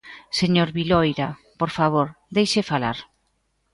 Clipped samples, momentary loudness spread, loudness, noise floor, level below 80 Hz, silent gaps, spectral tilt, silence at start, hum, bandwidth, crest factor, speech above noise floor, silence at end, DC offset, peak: under 0.1%; 8 LU; -22 LUFS; -69 dBFS; -50 dBFS; none; -5.5 dB/octave; 0.05 s; none; 11.5 kHz; 18 dB; 48 dB; 0.7 s; under 0.1%; -6 dBFS